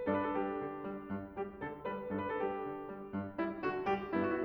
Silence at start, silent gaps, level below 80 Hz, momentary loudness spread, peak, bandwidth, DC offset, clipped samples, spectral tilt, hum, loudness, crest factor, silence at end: 0 s; none; -64 dBFS; 8 LU; -20 dBFS; over 20 kHz; under 0.1%; under 0.1%; -8.5 dB/octave; none; -39 LUFS; 18 dB; 0 s